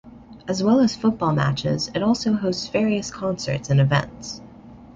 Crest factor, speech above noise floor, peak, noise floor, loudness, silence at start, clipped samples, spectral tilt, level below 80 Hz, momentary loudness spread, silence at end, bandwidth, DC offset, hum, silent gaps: 18 dB; 22 dB; -4 dBFS; -43 dBFS; -21 LUFS; 0.05 s; under 0.1%; -6 dB/octave; -50 dBFS; 14 LU; 0.05 s; 7.8 kHz; under 0.1%; none; none